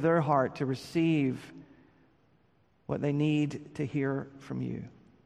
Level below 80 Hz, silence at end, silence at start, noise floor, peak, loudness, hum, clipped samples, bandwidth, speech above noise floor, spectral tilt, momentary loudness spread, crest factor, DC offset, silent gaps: -66 dBFS; 0.35 s; 0 s; -68 dBFS; -14 dBFS; -31 LUFS; none; under 0.1%; 12.5 kHz; 38 dB; -8 dB/octave; 15 LU; 18 dB; under 0.1%; none